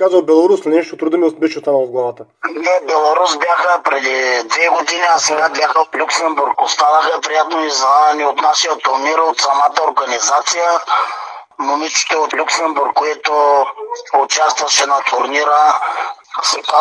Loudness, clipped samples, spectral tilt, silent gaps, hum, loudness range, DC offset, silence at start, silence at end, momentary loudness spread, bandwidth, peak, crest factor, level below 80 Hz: -14 LUFS; under 0.1%; -0.5 dB/octave; none; none; 2 LU; under 0.1%; 0 s; 0 s; 7 LU; 10.5 kHz; 0 dBFS; 14 dB; -74 dBFS